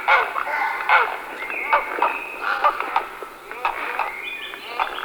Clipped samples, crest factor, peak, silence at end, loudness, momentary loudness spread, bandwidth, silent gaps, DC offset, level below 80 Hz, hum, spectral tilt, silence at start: under 0.1%; 22 dB; -2 dBFS; 0 s; -22 LUFS; 12 LU; over 20 kHz; none; under 0.1%; -56 dBFS; none; -1.5 dB/octave; 0 s